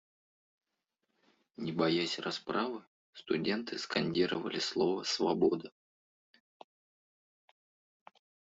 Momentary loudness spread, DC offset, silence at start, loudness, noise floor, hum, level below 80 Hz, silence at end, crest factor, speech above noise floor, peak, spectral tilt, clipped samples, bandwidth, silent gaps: 9 LU; under 0.1%; 1.6 s; -33 LUFS; -85 dBFS; none; -74 dBFS; 2.8 s; 20 dB; 52 dB; -16 dBFS; -4.5 dB/octave; under 0.1%; 8 kHz; 2.87-3.13 s